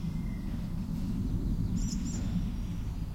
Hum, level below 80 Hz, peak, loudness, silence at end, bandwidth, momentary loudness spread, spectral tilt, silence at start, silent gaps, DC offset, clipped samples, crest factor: none; -36 dBFS; -20 dBFS; -35 LUFS; 0 s; 16 kHz; 4 LU; -6.5 dB/octave; 0 s; none; under 0.1%; under 0.1%; 12 dB